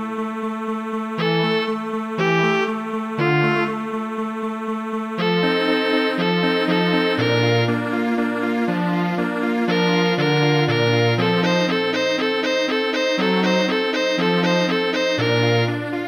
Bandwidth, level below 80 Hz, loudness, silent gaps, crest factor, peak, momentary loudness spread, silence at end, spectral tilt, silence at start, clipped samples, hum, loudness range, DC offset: 19 kHz; -70 dBFS; -20 LUFS; none; 14 dB; -6 dBFS; 8 LU; 0 s; -6 dB/octave; 0 s; under 0.1%; none; 3 LU; under 0.1%